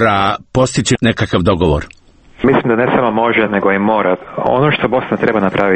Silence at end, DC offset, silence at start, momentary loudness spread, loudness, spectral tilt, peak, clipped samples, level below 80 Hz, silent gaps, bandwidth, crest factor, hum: 0 s; under 0.1%; 0 s; 3 LU; -14 LUFS; -5.5 dB/octave; 0 dBFS; under 0.1%; -34 dBFS; none; 8.8 kHz; 14 dB; none